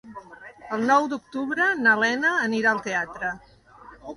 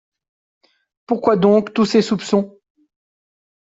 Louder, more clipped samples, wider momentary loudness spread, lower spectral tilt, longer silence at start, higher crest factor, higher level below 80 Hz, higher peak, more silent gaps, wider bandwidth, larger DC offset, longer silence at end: second, -23 LUFS vs -17 LUFS; neither; first, 22 LU vs 8 LU; second, -4 dB/octave vs -6.5 dB/octave; second, 0.05 s vs 1.1 s; about the same, 18 dB vs 16 dB; about the same, -62 dBFS vs -60 dBFS; second, -8 dBFS vs -2 dBFS; neither; first, 11.5 kHz vs 7.8 kHz; neither; second, 0 s vs 1.15 s